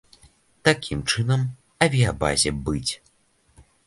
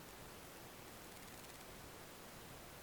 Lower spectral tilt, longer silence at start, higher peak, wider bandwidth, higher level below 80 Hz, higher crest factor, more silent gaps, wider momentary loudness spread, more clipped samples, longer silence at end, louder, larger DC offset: about the same, -4 dB/octave vs -3 dB/octave; first, 0.65 s vs 0 s; first, 0 dBFS vs -40 dBFS; second, 11.5 kHz vs over 20 kHz; first, -42 dBFS vs -68 dBFS; first, 24 dB vs 16 dB; neither; first, 8 LU vs 1 LU; neither; first, 0.25 s vs 0 s; first, -23 LUFS vs -54 LUFS; neither